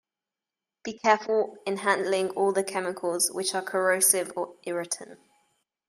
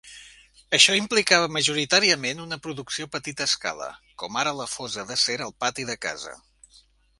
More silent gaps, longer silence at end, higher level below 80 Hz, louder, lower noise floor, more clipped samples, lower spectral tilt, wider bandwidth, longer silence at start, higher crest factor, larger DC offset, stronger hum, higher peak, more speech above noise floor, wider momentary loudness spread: neither; about the same, 0.75 s vs 0.85 s; second, -80 dBFS vs -62 dBFS; second, -26 LUFS vs -23 LUFS; first, -90 dBFS vs -58 dBFS; neither; about the same, -2 dB/octave vs -1.5 dB/octave; first, 15.5 kHz vs 11.5 kHz; first, 0.85 s vs 0.05 s; about the same, 22 dB vs 24 dB; neither; neither; second, -6 dBFS vs -2 dBFS; first, 63 dB vs 33 dB; second, 12 LU vs 16 LU